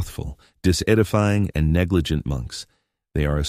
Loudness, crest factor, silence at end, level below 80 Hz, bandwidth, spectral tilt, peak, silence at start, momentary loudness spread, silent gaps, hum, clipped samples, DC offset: -22 LUFS; 18 dB; 0 s; -32 dBFS; 15.5 kHz; -6 dB/octave; -4 dBFS; 0 s; 15 LU; none; none; under 0.1%; under 0.1%